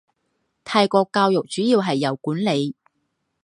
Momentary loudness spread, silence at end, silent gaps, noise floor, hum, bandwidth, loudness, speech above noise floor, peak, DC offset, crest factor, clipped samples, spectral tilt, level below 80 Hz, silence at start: 6 LU; 0.7 s; none; -73 dBFS; none; 11.5 kHz; -20 LUFS; 54 dB; -2 dBFS; under 0.1%; 20 dB; under 0.1%; -5.5 dB/octave; -70 dBFS; 0.65 s